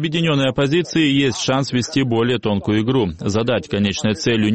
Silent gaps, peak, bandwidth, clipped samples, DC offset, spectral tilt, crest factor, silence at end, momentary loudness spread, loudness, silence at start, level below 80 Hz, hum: none; -6 dBFS; 8.8 kHz; under 0.1%; 0.3%; -5.5 dB/octave; 12 dB; 0 s; 3 LU; -18 LUFS; 0 s; -46 dBFS; none